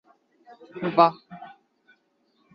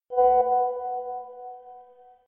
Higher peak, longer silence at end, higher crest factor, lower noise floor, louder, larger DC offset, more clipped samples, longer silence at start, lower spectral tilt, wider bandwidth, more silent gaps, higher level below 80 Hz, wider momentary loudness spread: first, -2 dBFS vs -10 dBFS; first, 1.05 s vs 0.45 s; first, 26 dB vs 16 dB; first, -68 dBFS vs -52 dBFS; about the same, -22 LUFS vs -24 LUFS; neither; neither; first, 0.75 s vs 0.1 s; about the same, -8.5 dB/octave vs -8.5 dB/octave; first, 5.6 kHz vs 3.2 kHz; neither; second, -74 dBFS vs -62 dBFS; first, 25 LU vs 22 LU